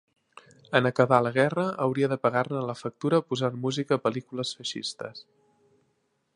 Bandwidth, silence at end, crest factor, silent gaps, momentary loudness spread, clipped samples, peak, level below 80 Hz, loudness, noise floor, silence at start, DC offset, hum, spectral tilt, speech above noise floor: 11.5 kHz; 1.15 s; 24 dB; none; 12 LU; under 0.1%; -4 dBFS; -72 dBFS; -27 LUFS; -73 dBFS; 0.7 s; under 0.1%; none; -5.5 dB/octave; 47 dB